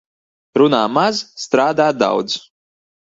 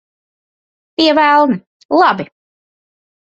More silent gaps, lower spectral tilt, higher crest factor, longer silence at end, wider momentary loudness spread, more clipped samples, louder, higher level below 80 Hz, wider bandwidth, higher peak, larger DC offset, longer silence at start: second, none vs 1.67-1.89 s; about the same, -4.5 dB/octave vs -5.5 dB/octave; about the same, 18 dB vs 16 dB; second, 0.65 s vs 1.1 s; second, 10 LU vs 14 LU; neither; second, -16 LUFS vs -13 LUFS; about the same, -62 dBFS vs -60 dBFS; about the same, 7.8 kHz vs 7.8 kHz; about the same, 0 dBFS vs 0 dBFS; neither; second, 0.55 s vs 1 s